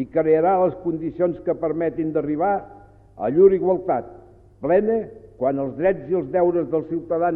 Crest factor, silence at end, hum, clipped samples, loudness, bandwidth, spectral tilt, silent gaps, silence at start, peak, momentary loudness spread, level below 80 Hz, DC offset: 18 dB; 0 s; none; under 0.1%; -21 LUFS; 3.7 kHz; -11.5 dB/octave; none; 0 s; -4 dBFS; 10 LU; -52 dBFS; under 0.1%